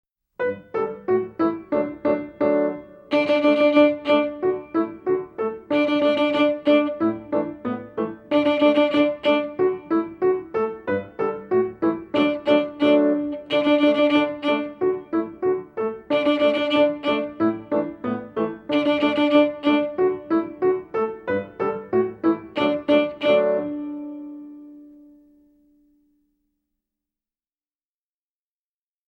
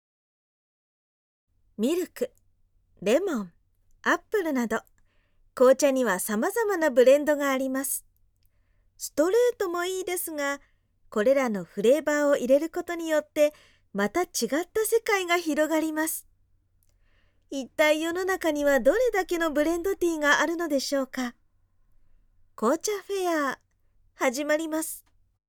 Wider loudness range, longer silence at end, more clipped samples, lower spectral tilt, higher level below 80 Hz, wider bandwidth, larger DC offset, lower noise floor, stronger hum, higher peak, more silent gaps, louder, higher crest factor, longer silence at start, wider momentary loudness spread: second, 3 LU vs 6 LU; first, 4.25 s vs 0.5 s; neither; first, -7 dB/octave vs -3 dB/octave; about the same, -62 dBFS vs -58 dBFS; second, 6.2 kHz vs 19.5 kHz; neither; first, under -90 dBFS vs -65 dBFS; neither; about the same, -6 dBFS vs -8 dBFS; neither; first, -22 LUFS vs -26 LUFS; about the same, 16 dB vs 20 dB; second, 0.4 s vs 1.8 s; about the same, 10 LU vs 11 LU